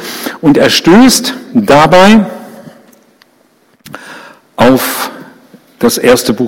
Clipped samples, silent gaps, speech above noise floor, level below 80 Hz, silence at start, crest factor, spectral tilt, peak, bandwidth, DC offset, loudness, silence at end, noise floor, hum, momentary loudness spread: 1%; none; 43 dB; -40 dBFS; 0 s; 10 dB; -4 dB/octave; 0 dBFS; 17 kHz; under 0.1%; -7 LUFS; 0 s; -50 dBFS; none; 23 LU